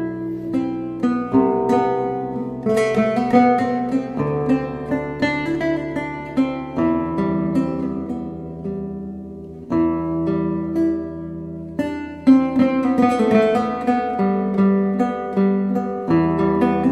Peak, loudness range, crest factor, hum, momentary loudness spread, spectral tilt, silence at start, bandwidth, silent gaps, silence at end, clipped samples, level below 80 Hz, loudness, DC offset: -2 dBFS; 6 LU; 16 dB; none; 12 LU; -8 dB/octave; 0 s; 11 kHz; none; 0 s; under 0.1%; -46 dBFS; -20 LUFS; under 0.1%